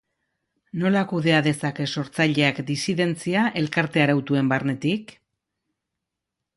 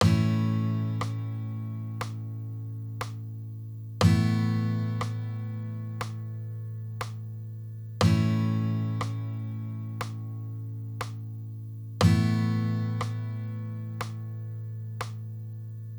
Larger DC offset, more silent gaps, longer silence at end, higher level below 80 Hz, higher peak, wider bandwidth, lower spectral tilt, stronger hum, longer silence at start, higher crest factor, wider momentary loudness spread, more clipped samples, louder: neither; neither; first, 1.5 s vs 0 s; second, -64 dBFS vs -56 dBFS; first, -4 dBFS vs -8 dBFS; second, 11.5 kHz vs over 20 kHz; second, -5.5 dB/octave vs -7 dB/octave; neither; first, 0.75 s vs 0 s; about the same, 20 dB vs 20 dB; second, 7 LU vs 15 LU; neither; first, -22 LUFS vs -31 LUFS